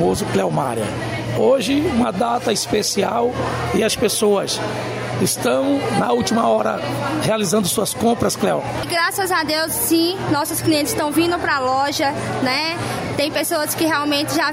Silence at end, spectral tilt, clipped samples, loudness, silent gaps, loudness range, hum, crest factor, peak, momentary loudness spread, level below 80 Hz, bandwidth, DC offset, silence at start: 0 s; -4 dB/octave; under 0.1%; -19 LUFS; none; 1 LU; none; 14 dB; -4 dBFS; 5 LU; -46 dBFS; 16.5 kHz; under 0.1%; 0 s